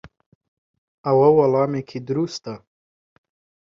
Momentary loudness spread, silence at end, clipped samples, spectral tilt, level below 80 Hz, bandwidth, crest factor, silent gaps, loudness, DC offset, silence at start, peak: 18 LU; 1.15 s; under 0.1%; -7.5 dB/octave; -62 dBFS; 7.6 kHz; 18 dB; 0.26-0.41 s, 0.48-1.04 s; -20 LUFS; under 0.1%; 0.05 s; -4 dBFS